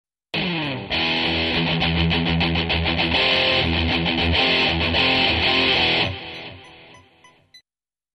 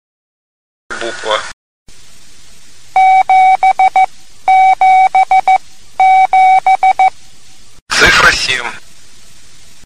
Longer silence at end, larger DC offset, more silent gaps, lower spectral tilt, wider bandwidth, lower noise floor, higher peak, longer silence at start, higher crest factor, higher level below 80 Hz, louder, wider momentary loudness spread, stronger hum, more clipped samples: second, 0.6 s vs 1.1 s; second, under 0.1% vs 3%; second, none vs 1.53-1.86 s, 7.82-7.86 s; first, -5.5 dB/octave vs -1.5 dB/octave; second, 10.5 kHz vs 14 kHz; first, under -90 dBFS vs -43 dBFS; second, -6 dBFS vs 0 dBFS; second, 0.35 s vs 0.9 s; about the same, 14 dB vs 12 dB; about the same, -36 dBFS vs -38 dBFS; second, -19 LUFS vs -9 LUFS; second, 9 LU vs 13 LU; neither; neither